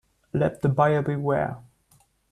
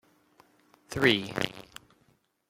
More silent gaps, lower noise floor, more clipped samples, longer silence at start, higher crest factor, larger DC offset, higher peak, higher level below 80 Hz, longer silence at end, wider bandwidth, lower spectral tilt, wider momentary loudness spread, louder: neither; second, -62 dBFS vs -69 dBFS; neither; second, 0.35 s vs 0.9 s; second, 18 dB vs 26 dB; neither; about the same, -8 dBFS vs -8 dBFS; about the same, -56 dBFS vs -60 dBFS; second, 0.7 s vs 0.9 s; second, 11 kHz vs 16.5 kHz; first, -9 dB/octave vs -4.5 dB/octave; second, 10 LU vs 25 LU; first, -24 LUFS vs -28 LUFS